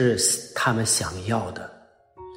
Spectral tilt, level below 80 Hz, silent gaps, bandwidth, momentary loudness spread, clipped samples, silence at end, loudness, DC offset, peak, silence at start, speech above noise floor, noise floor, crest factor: -3 dB/octave; -54 dBFS; none; 16 kHz; 16 LU; under 0.1%; 0 s; -23 LUFS; under 0.1%; -6 dBFS; 0 s; 28 dB; -51 dBFS; 18 dB